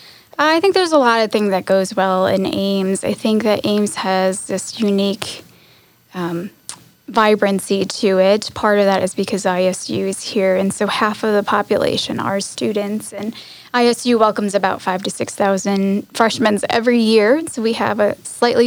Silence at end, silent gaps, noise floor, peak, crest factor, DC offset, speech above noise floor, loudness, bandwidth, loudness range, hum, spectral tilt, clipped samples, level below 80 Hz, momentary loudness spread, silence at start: 0 s; none; -51 dBFS; -2 dBFS; 16 dB; under 0.1%; 34 dB; -17 LUFS; over 20 kHz; 4 LU; none; -4.5 dB/octave; under 0.1%; -62 dBFS; 10 LU; 0.4 s